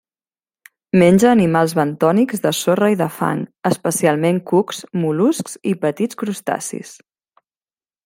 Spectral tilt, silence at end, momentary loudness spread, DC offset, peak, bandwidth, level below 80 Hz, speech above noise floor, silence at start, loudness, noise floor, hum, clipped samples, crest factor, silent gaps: -5.5 dB/octave; 1.1 s; 10 LU; under 0.1%; -2 dBFS; 16.5 kHz; -58 dBFS; over 73 dB; 0.95 s; -17 LUFS; under -90 dBFS; none; under 0.1%; 16 dB; none